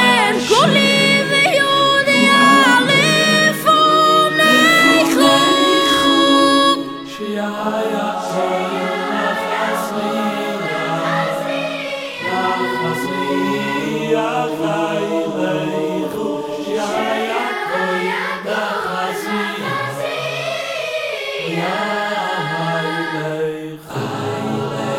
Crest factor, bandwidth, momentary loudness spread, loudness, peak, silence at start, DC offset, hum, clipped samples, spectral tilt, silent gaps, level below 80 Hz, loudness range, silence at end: 16 dB; over 20 kHz; 11 LU; -16 LUFS; 0 dBFS; 0 s; under 0.1%; none; under 0.1%; -3.5 dB/octave; none; -58 dBFS; 9 LU; 0 s